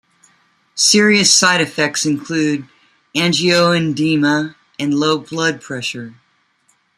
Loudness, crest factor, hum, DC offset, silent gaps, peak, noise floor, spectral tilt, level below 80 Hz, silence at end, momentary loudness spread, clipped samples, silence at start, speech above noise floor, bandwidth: -15 LUFS; 16 dB; none; under 0.1%; none; 0 dBFS; -60 dBFS; -3 dB/octave; -60 dBFS; 0.85 s; 14 LU; under 0.1%; 0.75 s; 45 dB; 14.5 kHz